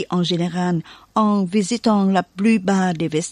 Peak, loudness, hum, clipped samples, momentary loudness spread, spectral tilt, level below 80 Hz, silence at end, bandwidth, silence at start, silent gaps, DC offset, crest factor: -4 dBFS; -19 LUFS; none; under 0.1%; 5 LU; -6 dB/octave; -58 dBFS; 0 s; 11 kHz; 0 s; none; under 0.1%; 14 dB